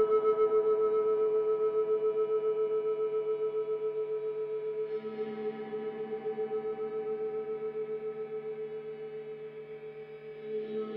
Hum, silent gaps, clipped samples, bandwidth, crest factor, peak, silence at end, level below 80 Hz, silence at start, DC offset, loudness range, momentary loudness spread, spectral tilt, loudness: none; none; under 0.1%; 4.1 kHz; 14 dB; -18 dBFS; 0 s; -80 dBFS; 0 s; under 0.1%; 9 LU; 14 LU; -8.5 dB/octave; -33 LUFS